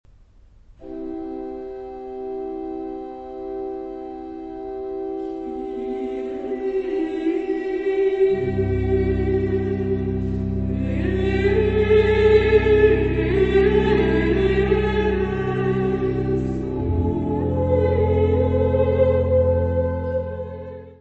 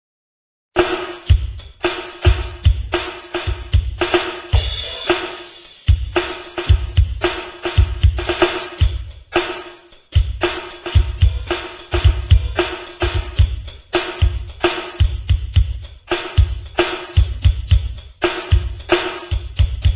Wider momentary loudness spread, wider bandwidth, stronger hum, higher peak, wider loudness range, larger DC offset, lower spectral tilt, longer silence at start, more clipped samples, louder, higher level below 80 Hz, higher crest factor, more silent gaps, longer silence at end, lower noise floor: first, 15 LU vs 8 LU; first, 7.6 kHz vs 4 kHz; neither; second, -4 dBFS vs 0 dBFS; first, 14 LU vs 1 LU; neither; second, -9 dB/octave vs -10.5 dB/octave; about the same, 0.8 s vs 0.75 s; neither; about the same, -21 LUFS vs -20 LUFS; second, -32 dBFS vs -20 dBFS; about the same, 16 dB vs 18 dB; neither; about the same, 0.05 s vs 0 s; first, -50 dBFS vs -41 dBFS